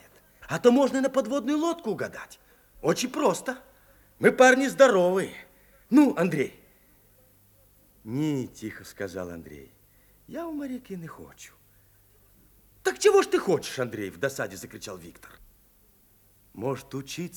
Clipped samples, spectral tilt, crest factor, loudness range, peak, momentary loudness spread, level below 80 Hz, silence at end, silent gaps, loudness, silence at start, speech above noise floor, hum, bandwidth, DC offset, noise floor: under 0.1%; -5 dB/octave; 22 dB; 15 LU; -6 dBFS; 21 LU; -64 dBFS; 0 s; none; -25 LUFS; 0.4 s; 35 dB; none; over 20 kHz; under 0.1%; -60 dBFS